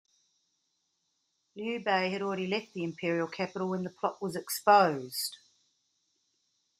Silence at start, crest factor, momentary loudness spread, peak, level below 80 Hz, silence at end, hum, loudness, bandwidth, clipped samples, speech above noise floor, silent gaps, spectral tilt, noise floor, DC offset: 1.55 s; 24 dB; 13 LU; -10 dBFS; -80 dBFS; 1.45 s; none; -30 LUFS; 15.5 kHz; under 0.1%; 48 dB; none; -4.5 dB/octave; -79 dBFS; under 0.1%